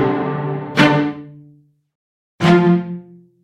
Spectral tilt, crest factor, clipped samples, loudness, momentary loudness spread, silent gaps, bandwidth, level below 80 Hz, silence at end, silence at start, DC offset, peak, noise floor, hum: -7 dB/octave; 18 dB; under 0.1%; -16 LUFS; 17 LU; 1.95-2.39 s; 10.5 kHz; -56 dBFS; 0.4 s; 0 s; under 0.1%; 0 dBFS; -50 dBFS; none